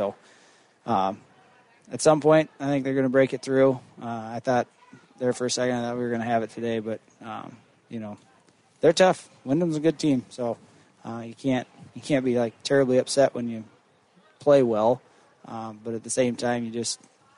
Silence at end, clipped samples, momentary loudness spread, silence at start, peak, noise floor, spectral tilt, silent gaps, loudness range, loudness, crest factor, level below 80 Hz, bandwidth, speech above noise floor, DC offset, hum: 0.45 s; under 0.1%; 18 LU; 0 s; -6 dBFS; -60 dBFS; -5 dB/octave; none; 5 LU; -25 LUFS; 20 dB; -68 dBFS; 11 kHz; 36 dB; under 0.1%; none